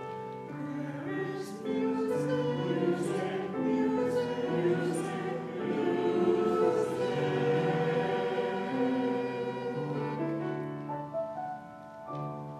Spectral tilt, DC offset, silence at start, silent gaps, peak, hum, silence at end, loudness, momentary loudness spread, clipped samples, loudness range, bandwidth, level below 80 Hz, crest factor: -7 dB/octave; under 0.1%; 0 s; none; -14 dBFS; none; 0 s; -32 LUFS; 10 LU; under 0.1%; 4 LU; 13 kHz; -74 dBFS; 16 dB